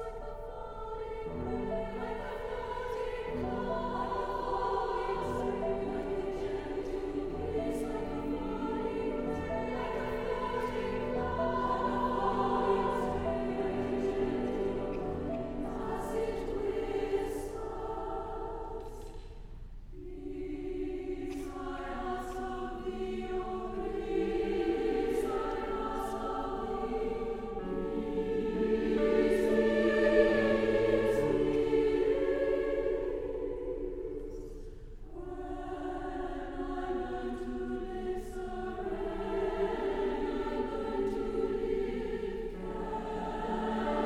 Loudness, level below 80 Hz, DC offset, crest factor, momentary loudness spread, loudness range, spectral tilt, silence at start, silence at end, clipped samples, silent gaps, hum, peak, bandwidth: -34 LUFS; -46 dBFS; under 0.1%; 22 dB; 11 LU; 11 LU; -6.5 dB/octave; 0 s; 0 s; under 0.1%; none; none; -12 dBFS; 14 kHz